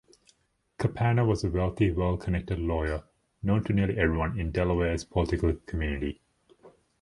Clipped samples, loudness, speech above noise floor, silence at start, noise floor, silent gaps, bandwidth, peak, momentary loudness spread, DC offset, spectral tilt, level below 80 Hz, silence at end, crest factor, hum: under 0.1%; -28 LUFS; 40 dB; 0.8 s; -67 dBFS; none; 11.5 kHz; -10 dBFS; 7 LU; under 0.1%; -7.5 dB/octave; -38 dBFS; 0.3 s; 18 dB; none